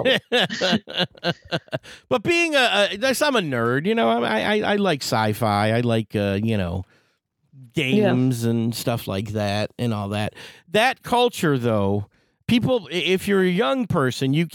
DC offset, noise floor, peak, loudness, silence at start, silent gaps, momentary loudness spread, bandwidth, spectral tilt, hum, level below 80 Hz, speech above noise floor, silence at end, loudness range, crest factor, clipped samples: under 0.1%; -68 dBFS; -6 dBFS; -21 LUFS; 0 s; none; 9 LU; 18 kHz; -5 dB/octave; none; -58 dBFS; 47 dB; 0.05 s; 3 LU; 16 dB; under 0.1%